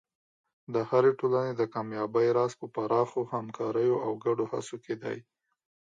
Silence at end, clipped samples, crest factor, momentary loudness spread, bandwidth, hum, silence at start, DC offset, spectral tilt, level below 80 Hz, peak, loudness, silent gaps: 0.75 s; under 0.1%; 18 dB; 11 LU; 9.4 kHz; none; 0.7 s; under 0.1%; -7 dB/octave; -78 dBFS; -12 dBFS; -29 LUFS; none